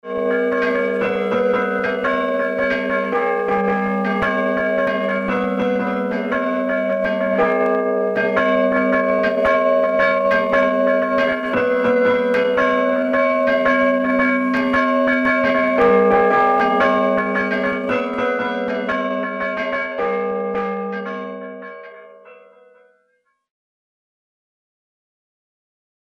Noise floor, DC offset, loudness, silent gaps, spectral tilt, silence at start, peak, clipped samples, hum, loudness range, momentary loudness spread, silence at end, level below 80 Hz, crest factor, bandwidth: -66 dBFS; under 0.1%; -18 LUFS; none; -7 dB/octave; 0.05 s; -4 dBFS; under 0.1%; none; 8 LU; 6 LU; 3.65 s; -52 dBFS; 14 dB; 7.8 kHz